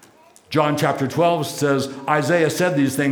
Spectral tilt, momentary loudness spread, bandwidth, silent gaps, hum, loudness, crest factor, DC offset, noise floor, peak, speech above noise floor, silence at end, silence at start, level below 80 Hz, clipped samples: -5.5 dB/octave; 3 LU; over 20 kHz; none; none; -20 LUFS; 18 dB; under 0.1%; -50 dBFS; -2 dBFS; 31 dB; 0 s; 0.5 s; -64 dBFS; under 0.1%